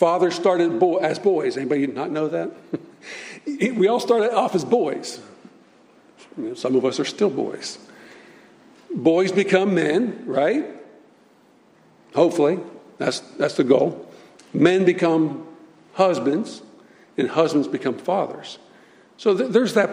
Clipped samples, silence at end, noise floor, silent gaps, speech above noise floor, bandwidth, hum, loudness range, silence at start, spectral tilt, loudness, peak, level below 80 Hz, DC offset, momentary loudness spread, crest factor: under 0.1%; 0 s; -55 dBFS; none; 35 dB; 14.5 kHz; none; 4 LU; 0 s; -5.5 dB/octave; -21 LUFS; -2 dBFS; -72 dBFS; under 0.1%; 15 LU; 20 dB